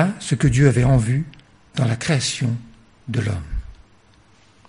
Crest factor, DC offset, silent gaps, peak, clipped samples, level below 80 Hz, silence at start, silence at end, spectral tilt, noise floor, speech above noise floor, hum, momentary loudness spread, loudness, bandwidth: 20 dB; 0.1%; none; -2 dBFS; under 0.1%; -36 dBFS; 0 s; 0.95 s; -6 dB/octave; -53 dBFS; 35 dB; none; 17 LU; -20 LUFS; 11 kHz